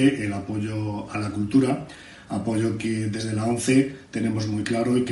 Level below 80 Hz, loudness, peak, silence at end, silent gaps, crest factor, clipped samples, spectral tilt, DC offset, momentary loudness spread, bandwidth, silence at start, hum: -56 dBFS; -25 LUFS; -8 dBFS; 0 s; none; 16 dB; under 0.1%; -6 dB/octave; under 0.1%; 8 LU; 11.5 kHz; 0 s; none